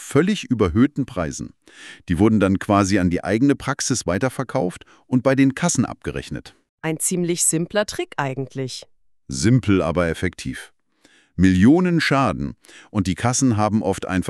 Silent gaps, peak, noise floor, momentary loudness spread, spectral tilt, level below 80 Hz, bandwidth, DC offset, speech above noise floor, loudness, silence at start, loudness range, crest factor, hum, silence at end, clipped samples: 6.69-6.78 s; -2 dBFS; -57 dBFS; 14 LU; -5 dB/octave; -44 dBFS; 13.5 kHz; under 0.1%; 38 dB; -20 LUFS; 0 s; 4 LU; 18 dB; none; 0 s; under 0.1%